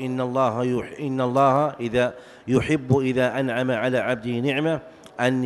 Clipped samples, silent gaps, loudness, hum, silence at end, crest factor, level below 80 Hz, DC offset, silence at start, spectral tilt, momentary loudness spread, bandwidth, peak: under 0.1%; none; -23 LUFS; none; 0 s; 18 dB; -54 dBFS; under 0.1%; 0 s; -7 dB/octave; 7 LU; 12 kHz; -6 dBFS